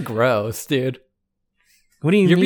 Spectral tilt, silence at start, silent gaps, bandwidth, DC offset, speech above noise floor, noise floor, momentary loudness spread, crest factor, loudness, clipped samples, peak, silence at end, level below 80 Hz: -6.5 dB/octave; 0 s; none; 19 kHz; under 0.1%; 56 dB; -74 dBFS; 10 LU; 16 dB; -20 LUFS; under 0.1%; -4 dBFS; 0 s; -60 dBFS